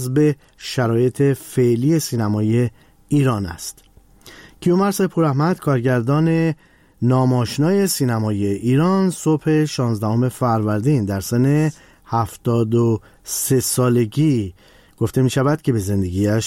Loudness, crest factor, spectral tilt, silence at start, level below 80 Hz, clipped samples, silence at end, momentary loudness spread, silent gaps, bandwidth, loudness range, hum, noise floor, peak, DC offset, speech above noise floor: -19 LUFS; 10 dB; -6.5 dB/octave; 0 s; -50 dBFS; under 0.1%; 0 s; 6 LU; none; 16.5 kHz; 2 LU; none; -46 dBFS; -8 dBFS; under 0.1%; 28 dB